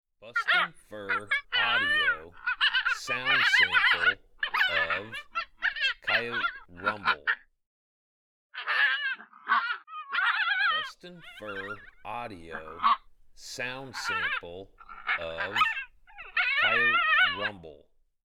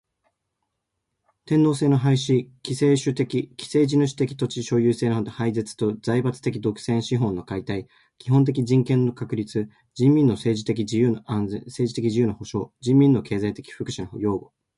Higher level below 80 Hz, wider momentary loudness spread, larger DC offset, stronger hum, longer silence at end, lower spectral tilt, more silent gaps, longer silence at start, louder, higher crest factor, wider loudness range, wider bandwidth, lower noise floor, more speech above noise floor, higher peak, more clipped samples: about the same, -60 dBFS vs -56 dBFS; first, 18 LU vs 11 LU; neither; neither; first, 0.5 s vs 0.35 s; second, -1.5 dB/octave vs -7 dB/octave; first, 7.66-8.50 s vs none; second, 0.2 s vs 1.5 s; second, -27 LUFS vs -23 LUFS; about the same, 18 dB vs 16 dB; first, 8 LU vs 2 LU; first, 16 kHz vs 11.5 kHz; second, -49 dBFS vs -79 dBFS; second, 19 dB vs 57 dB; second, -12 dBFS vs -8 dBFS; neither